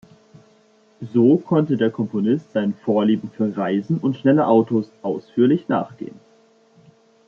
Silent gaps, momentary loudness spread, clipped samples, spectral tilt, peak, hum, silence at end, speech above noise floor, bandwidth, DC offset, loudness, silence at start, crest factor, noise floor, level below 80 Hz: none; 10 LU; under 0.1%; -9.5 dB/octave; -2 dBFS; none; 1.2 s; 37 dB; 6.8 kHz; under 0.1%; -20 LUFS; 1 s; 18 dB; -56 dBFS; -68 dBFS